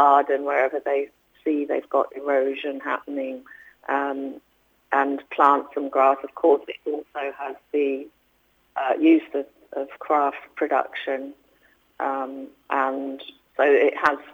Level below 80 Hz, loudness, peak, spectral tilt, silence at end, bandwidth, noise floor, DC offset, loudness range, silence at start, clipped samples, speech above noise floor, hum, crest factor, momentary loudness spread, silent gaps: -72 dBFS; -23 LUFS; -4 dBFS; -5 dB/octave; 0 s; 7.2 kHz; -64 dBFS; under 0.1%; 5 LU; 0 s; under 0.1%; 42 dB; none; 20 dB; 15 LU; none